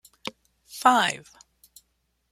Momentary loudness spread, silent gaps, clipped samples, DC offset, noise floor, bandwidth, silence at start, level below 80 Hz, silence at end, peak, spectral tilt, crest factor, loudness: 19 LU; none; under 0.1%; under 0.1%; -73 dBFS; 16.5 kHz; 0.75 s; -70 dBFS; 1.1 s; -4 dBFS; -2 dB/octave; 24 dB; -22 LUFS